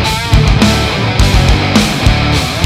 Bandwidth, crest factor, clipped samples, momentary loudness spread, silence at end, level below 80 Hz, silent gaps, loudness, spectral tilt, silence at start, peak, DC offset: 16 kHz; 10 dB; under 0.1%; 3 LU; 0 s; -16 dBFS; none; -10 LUFS; -5 dB/octave; 0 s; 0 dBFS; under 0.1%